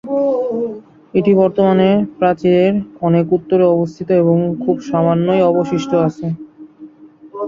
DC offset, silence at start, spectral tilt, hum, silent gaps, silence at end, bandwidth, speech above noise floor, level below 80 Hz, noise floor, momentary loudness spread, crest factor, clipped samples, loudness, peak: under 0.1%; 0.05 s; -8.5 dB/octave; none; none; 0 s; 7.4 kHz; 27 dB; -54 dBFS; -40 dBFS; 9 LU; 12 dB; under 0.1%; -15 LUFS; -2 dBFS